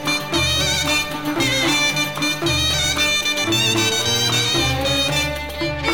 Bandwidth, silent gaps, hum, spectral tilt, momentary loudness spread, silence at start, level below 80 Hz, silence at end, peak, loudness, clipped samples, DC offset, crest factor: over 20 kHz; none; none; -2.5 dB/octave; 4 LU; 0 s; -36 dBFS; 0 s; -4 dBFS; -17 LUFS; under 0.1%; 0.8%; 14 dB